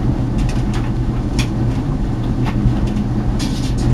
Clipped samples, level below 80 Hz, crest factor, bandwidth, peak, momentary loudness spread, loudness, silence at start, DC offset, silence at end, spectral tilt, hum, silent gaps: under 0.1%; -22 dBFS; 14 dB; 12 kHz; -2 dBFS; 3 LU; -19 LUFS; 0 s; under 0.1%; 0 s; -7 dB/octave; none; none